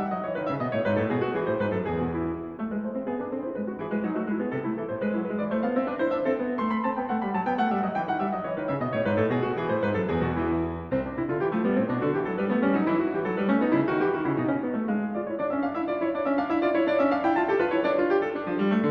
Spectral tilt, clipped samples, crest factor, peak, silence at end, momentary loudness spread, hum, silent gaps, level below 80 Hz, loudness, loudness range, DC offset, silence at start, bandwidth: -9.5 dB/octave; under 0.1%; 14 dB; -12 dBFS; 0 s; 6 LU; none; none; -54 dBFS; -27 LUFS; 4 LU; under 0.1%; 0 s; 6 kHz